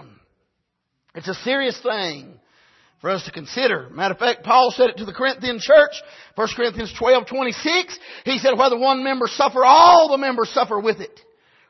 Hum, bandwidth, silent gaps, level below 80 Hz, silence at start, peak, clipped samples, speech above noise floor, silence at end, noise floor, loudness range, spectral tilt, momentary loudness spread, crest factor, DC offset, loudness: none; 6.2 kHz; none; -56 dBFS; 1.15 s; 0 dBFS; under 0.1%; 57 dB; 0.65 s; -75 dBFS; 9 LU; -3.5 dB/octave; 16 LU; 18 dB; under 0.1%; -18 LUFS